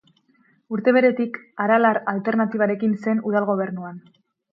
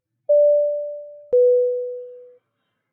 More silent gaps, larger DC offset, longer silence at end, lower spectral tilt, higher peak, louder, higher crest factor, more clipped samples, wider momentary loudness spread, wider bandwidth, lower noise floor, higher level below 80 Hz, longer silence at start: neither; neither; second, 0.55 s vs 0.7 s; about the same, -9 dB/octave vs -8 dB/octave; first, -4 dBFS vs -10 dBFS; about the same, -21 LUFS vs -19 LUFS; first, 18 dB vs 10 dB; neither; second, 11 LU vs 20 LU; first, 5.6 kHz vs 1 kHz; second, -61 dBFS vs -75 dBFS; about the same, -74 dBFS vs -76 dBFS; first, 0.7 s vs 0.3 s